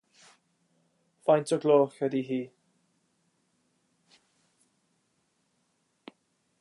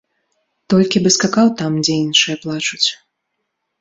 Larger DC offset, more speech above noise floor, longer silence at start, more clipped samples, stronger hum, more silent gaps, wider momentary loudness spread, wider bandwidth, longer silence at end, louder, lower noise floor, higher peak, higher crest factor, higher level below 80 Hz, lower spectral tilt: neither; second, 49 dB vs 59 dB; first, 1.25 s vs 0.7 s; neither; neither; neither; first, 11 LU vs 5 LU; first, 11.5 kHz vs 8 kHz; first, 4.15 s vs 0.85 s; second, -27 LUFS vs -15 LUFS; about the same, -74 dBFS vs -74 dBFS; second, -10 dBFS vs 0 dBFS; about the same, 22 dB vs 18 dB; second, -88 dBFS vs -56 dBFS; first, -6.5 dB/octave vs -3.5 dB/octave